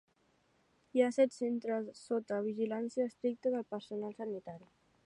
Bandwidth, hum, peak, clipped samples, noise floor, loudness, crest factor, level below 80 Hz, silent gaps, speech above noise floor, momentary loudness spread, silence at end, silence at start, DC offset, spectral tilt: 11 kHz; none; -18 dBFS; under 0.1%; -73 dBFS; -36 LUFS; 20 dB; -84 dBFS; none; 38 dB; 11 LU; 0.45 s; 0.95 s; under 0.1%; -6 dB/octave